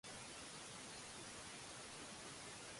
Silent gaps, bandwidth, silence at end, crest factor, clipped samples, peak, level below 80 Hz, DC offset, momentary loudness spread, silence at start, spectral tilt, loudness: none; 11.5 kHz; 0 s; 14 dB; under 0.1%; -40 dBFS; -74 dBFS; under 0.1%; 0 LU; 0.05 s; -2 dB/octave; -52 LUFS